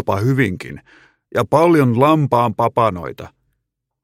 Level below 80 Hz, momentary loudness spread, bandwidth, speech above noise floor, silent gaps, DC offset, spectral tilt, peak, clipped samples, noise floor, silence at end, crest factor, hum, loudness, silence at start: -52 dBFS; 17 LU; 16 kHz; 59 dB; none; under 0.1%; -7.5 dB/octave; 0 dBFS; under 0.1%; -75 dBFS; 0.75 s; 16 dB; none; -16 LUFS; 0.05 s